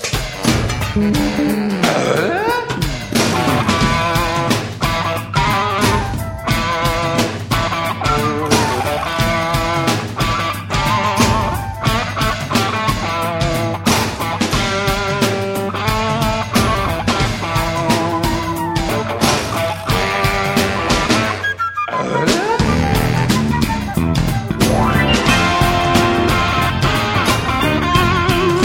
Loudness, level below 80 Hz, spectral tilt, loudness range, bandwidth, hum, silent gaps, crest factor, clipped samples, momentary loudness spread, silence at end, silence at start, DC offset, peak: -16 LUFS; -30 dBFS; -4.5 dB/octave; 3 LU; 17 kHz; none; none; 16 dB; under 0.1%; 5 LU; 0 s; 0 s; under 0.1%; 0 dBFS